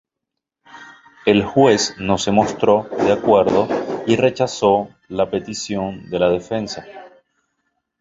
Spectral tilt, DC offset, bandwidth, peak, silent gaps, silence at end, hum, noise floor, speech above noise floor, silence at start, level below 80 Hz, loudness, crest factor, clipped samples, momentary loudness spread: -5 dB/octave; under 0.1%; 8 kHz; 0 dBFS; none; 0.9 s; none; -82 dBFS; 64 dB; 0.75 s; -50 dBFS; -18 LUFS; 18 dB; under 0.1%; 11 LU